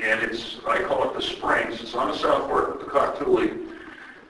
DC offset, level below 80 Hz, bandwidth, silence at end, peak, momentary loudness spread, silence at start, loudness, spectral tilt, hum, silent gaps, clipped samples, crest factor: under 0.1%; -52 dBFS; 12 kHz; 0.1 s; -6 dBFS; 9 LU; 0 s; -24 LUFS; -4.5 dB/octave; none; none; under 0.1%; 18 dB